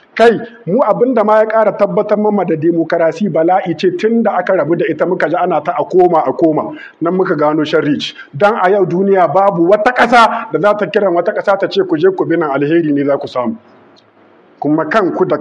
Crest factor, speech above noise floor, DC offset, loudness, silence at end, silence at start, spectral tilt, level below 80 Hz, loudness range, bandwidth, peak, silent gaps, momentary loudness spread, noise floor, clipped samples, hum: 12 dB; 34 dB; under 0.1%; -12 LUFS; 0 s; 0.15 s; -7 dB/octave; -58 dBFS; 4 LU; 10.5 kHz; 0 dBFS; none; 6 LU; -46 dBFS; under 0.1%; none